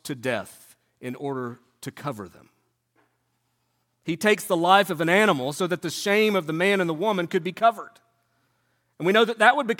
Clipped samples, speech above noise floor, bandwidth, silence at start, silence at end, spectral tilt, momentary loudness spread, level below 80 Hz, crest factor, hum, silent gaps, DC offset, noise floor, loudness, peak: under 0.1%; 50 dB; 17.5 kHz; 0.05 s; 0.05 s; -4.5 dB/octave; 19 LU; -74 dBFS; 22 dB; none; none; under 0.1%; -73 dBFS; -23 LUFS; -2 dBFS